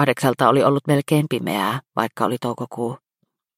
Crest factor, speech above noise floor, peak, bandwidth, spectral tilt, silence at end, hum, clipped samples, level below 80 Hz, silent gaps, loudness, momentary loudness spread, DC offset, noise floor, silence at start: 20 dB; 54 dB; -2 dBFS; 16 kHz; -6 dB/octave; 0.6 s; none; under 0.1%; -62 dBFS; none; -20 LUFS; 11 LU; under 0.1%; -74 dBFS; 0 s